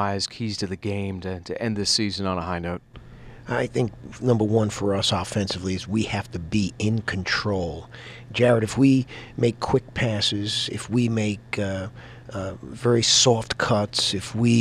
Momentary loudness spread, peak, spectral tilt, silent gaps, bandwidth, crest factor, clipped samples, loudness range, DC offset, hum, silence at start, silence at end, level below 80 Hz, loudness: 13 LU; -4 dBFS; -4.5 dB/octave; none; 13 kHz; 18 dB; under 0.1%; 4 LU; under 0.1%; none; 0 s; 0 s; -48 dBFS; -24 LUFS